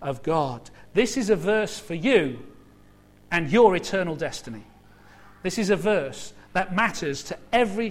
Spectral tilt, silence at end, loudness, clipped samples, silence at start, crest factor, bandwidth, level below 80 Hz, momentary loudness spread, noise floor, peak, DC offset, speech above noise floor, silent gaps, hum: -5 dB/octave; 0 s; -24 LUFS; under 0.1%; 0 s; 20 dB; 15.5 kHz; -52 dBFS; 14 LU; -53 dBFS; -4 dBFS; under 0.1%; 30 dB; none; 50 Hz at -55 dBFS